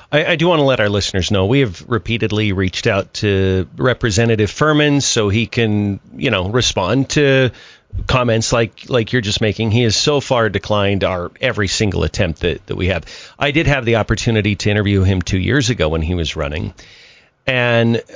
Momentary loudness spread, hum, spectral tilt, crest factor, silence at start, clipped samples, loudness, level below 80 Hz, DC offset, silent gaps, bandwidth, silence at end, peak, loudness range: 6 LU; none; -5 dB/octave; 14 dB; 0.1 s; under 0.1%; -16 LUFS; -32 dBFS; under 0.1%; none; 7.6 kHz; 0.05 s; -2 dBFS; 2 LU